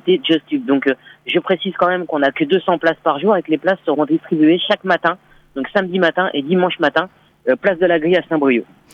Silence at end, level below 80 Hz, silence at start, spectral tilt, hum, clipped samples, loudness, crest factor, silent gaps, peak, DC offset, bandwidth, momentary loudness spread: 0.3 s; -60 dBFS; 0.05 s; -7 dB/octave; none; under 0.1%; -17 LUFS; 16 dB; none; -2 dBFS; under 0.1%; 6.6 kHz; 6 LU